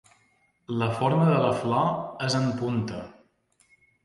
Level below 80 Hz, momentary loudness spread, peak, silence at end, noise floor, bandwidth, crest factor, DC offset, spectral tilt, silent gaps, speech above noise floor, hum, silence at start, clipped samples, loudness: -60 dBFS; 12 LU; -8 dBFS; 0.95 s; -67 dBFS; 11.5 kHz; 18 dB; under 0.1%; -6.5 dB/octave; none; 42 dB; none; 0.7 s; under 0.1%; -26 LUFS